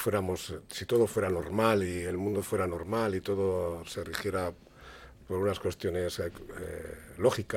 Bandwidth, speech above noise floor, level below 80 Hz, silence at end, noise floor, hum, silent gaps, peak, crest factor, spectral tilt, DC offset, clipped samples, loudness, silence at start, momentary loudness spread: 16.5 kHz; 20 dB; -54 dBFS; 0 s; -51 dBFS; none; none; -10 dBFS; 22 dB; -5.5 dB/octave; under 0.1%; under 0.1%; -32 LUFS; 0 s; 15 LU